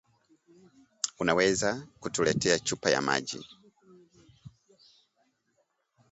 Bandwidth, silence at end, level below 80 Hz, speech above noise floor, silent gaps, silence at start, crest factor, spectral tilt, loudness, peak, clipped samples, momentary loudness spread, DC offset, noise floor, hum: 8.2 kHz; 1.65 s; -62 dBFS; 47 dB; none; 1.05 s; 24 dB; -3 dB/octave; -28 LUFS; -8 dBFS; under 0.1%; 13 LU; under 0.1%; -75 dBFS; none